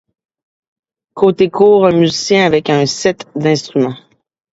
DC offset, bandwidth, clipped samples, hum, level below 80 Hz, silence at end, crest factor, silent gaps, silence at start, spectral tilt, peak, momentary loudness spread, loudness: under 0.1%; 8 kHz; under 0.1%; none; -54 dBFS; 0.55 s; 14 dB; none; 1.15 s; -5 dB/octave; 0 dBFS; 8 LU; -12 LUFS